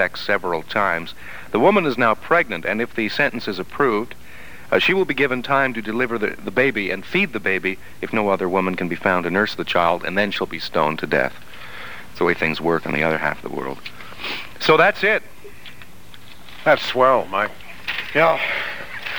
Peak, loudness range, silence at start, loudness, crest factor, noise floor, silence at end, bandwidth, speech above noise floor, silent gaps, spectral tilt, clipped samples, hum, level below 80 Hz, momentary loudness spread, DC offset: -2 dBFS; 2 LU; 0 s; -20 LUFS; 20 dB; -44 dBFS; 0 s; over 20 kHz; 24 dB; none; -5.5 dB/octave; under 0.1%; none; -52 dBFS; 17 LU; 2%